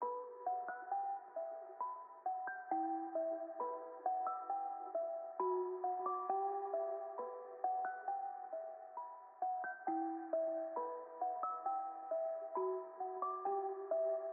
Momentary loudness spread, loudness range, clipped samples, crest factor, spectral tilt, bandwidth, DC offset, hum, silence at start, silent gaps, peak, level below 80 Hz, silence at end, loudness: 7 LU; 2 LU; under 0.1%; 16 dB; 4 dB/octave; 2.6 kHz; under 0.1%; none; 0 s; none; -26 dBFS; under -90 dBFS; 0 s; -42 LUFS